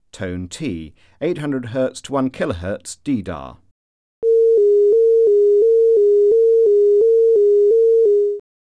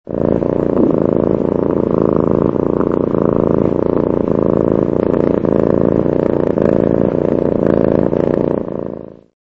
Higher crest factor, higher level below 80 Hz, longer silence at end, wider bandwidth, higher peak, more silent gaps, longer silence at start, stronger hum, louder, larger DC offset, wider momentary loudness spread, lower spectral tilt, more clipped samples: second, 8 dB vs 14 dB; second, -50 dBFS vs -36 dBFS; about the same, 0.35 s vs 0.3 s; first, 10.5 kHz vs 6 kHz; second, -8 dBFS vs 0 dBFS; first, 3.71-4.22 s vs none; about the same, 0.2 s vs 0.1 s; neither; about the same, -15 LUFS vs -15 LUFS; neither; first, 14 LU vs 2 LU; second, -6.5 dB/octave vs -11 dB/octave; neither